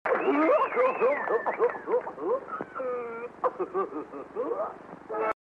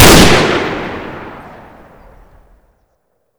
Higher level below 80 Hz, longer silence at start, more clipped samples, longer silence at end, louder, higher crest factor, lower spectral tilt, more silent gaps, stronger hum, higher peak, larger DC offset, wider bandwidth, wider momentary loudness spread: second, -70 dBFS vs -26 dBFS; about the same, 0.05 s vs 0 s; second, under 0.1% vs 3%; second, 0.15 s vs 2 s; second, -29 LUFS vs -9 LUFS; about the same, 16 dB vs 12 dB; first, -7 dB/octave vs -3.5 dB/octave; neither; neither; second, -12 dBFS vs 0 dBFS; neither; second, 5.8 kHz vs over 20 kHz; second, 13 LU vs 25 LU